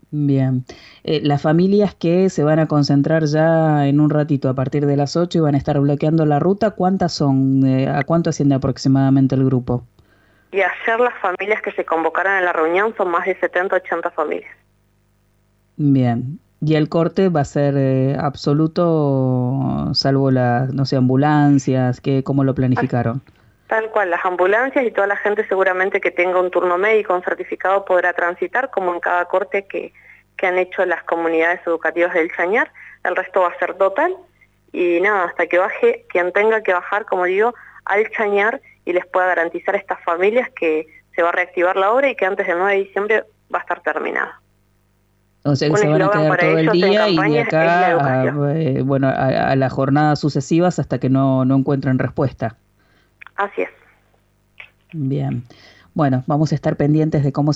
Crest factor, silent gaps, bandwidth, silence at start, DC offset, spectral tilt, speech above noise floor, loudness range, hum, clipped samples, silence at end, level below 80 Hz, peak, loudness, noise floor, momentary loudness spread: 14 dB; none; 8 kHz; 0.1 s; under 0.1%; -7.5 dB/octave; 43 dB; 5 LU; 50 Hz at -45 dBFS; under 0.1%; 0 s; -52 dBFS; -4 dBFS; -17 LUFS; -60 dBFS; 7 LU